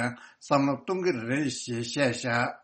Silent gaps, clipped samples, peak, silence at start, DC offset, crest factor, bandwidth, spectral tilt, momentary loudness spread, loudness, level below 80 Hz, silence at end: none; under 0.1%; -8 dBFS; 0 s; under 0.1%; 20 dB; 8.8 kHz; -5 dB/octave; 7 LU; -28 LUFS; -66 dBFS; 0.05 s